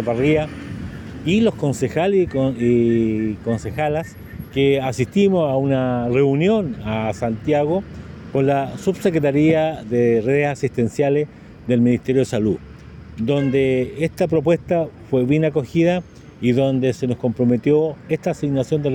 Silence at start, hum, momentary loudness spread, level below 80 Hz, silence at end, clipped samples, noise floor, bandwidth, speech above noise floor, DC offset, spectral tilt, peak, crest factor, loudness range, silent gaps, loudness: 0 s; none; 9 LU; -46 dBFS; 0 s; under 0.1%; -38 dBFS; 16.5 kHz; 20 dB; under 0.1%; -7.5 dB/octave; -6 dBFS; 14 dB; 1 LU; none; -19 LUFS